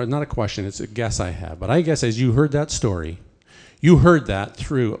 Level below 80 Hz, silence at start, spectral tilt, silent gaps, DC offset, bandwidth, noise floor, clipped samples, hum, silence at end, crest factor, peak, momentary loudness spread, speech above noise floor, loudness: -36 dBFS; 0 s; -6 dB/octave; none; under 0.1%; 10 kHz; -50 dBFS; under 0.1%; none; 0 s; 18 dB; 0 dBFS; 14 LU; 31 dB; -20 LUFS